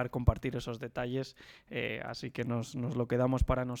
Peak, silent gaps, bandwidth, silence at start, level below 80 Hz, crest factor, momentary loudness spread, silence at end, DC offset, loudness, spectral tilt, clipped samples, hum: -10 dBFS; none; 15 kHz; 0 s; -42 dBFS; 24 dB; 10 LU; 0 s; under 0.1%; -34 LUFS; -7 dB/octave; under 0.1%; none